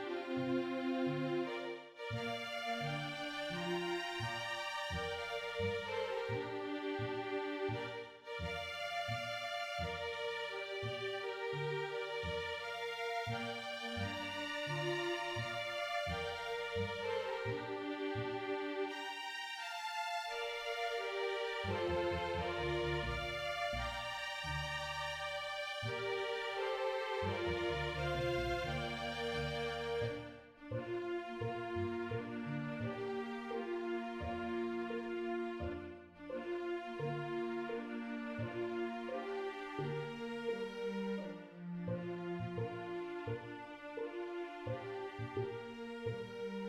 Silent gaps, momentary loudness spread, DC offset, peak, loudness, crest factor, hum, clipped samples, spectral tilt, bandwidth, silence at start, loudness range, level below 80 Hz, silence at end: none; 6 LU; under 0.1%; -26 dBFS; -41 LUFS; 14 dB; none; under 0.1%; -5.5 dB/octave; 16 kHz; 0 s; 4 LU; -60 dBFS; 0 s